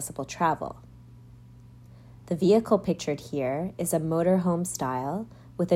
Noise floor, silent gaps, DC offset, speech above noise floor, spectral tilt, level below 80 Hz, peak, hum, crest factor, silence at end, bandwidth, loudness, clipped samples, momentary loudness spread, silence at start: -49 dBFS; none; under 0.1%; 23 dB; -6 dB/octave; -58 dBFS; -10 dBFS; none; 18 dB; 0 s; 16 kHz; -27 LUFS; under 0.1%; 12 LU; 0 s